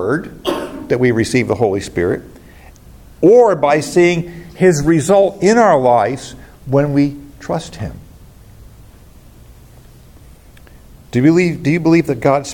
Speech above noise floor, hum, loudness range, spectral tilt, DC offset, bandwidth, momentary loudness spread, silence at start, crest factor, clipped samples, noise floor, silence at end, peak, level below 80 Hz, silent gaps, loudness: 28 dB; none; 11 LU; -6.5 dB/octave; under 0.1%; 17 kHz; 13 LU; 0 s; 14 dB; under 0.1%; -41 dBFS; 0 s; 0 dBFS; -42 dBFS; none; -14 LUFS